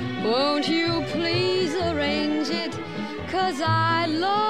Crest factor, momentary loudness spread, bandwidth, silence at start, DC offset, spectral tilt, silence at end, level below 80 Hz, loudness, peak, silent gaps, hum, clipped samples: 14 dB; 7 LU; 13 kHz; 0 s; 0.4%; -5.5 dB/octave; 0 s; -52 dBFS; -24 LUFS; -10 dBFS; none; none; under 0.1%